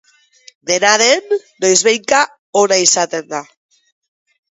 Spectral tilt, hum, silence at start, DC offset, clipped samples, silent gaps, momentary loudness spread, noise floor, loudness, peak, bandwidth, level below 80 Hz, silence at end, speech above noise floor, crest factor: -1 dB/octave; none; 0.65 s; under 0.1%; under 0.1%; 2.39-2.53 s; 12 LU; -47 dBFS; -13 LUFS; 0 dBFS; 11 kHz; -64 dBFS; 1.1 s; 33 dB; 16 dB